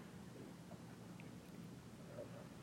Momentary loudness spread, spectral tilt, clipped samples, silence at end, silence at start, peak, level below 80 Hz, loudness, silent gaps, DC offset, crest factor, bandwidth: 2 LU; -6 dB/octave; under 0.1%; 0 s; 0 s; -38 dBFS; -74 dBFS; -56 LUFS; none; under 0.1%; 16 dB; 16 kHz